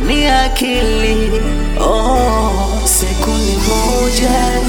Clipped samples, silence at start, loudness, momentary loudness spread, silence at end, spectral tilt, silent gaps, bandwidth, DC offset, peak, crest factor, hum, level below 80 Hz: under 0.1%; 0 s; -14 LUFS; 4 LU; 0 s; -4 dB/octave; none; 19.5 kHz; under 0.1%; 0 dBFS; 12 dB; none; -16 dBFS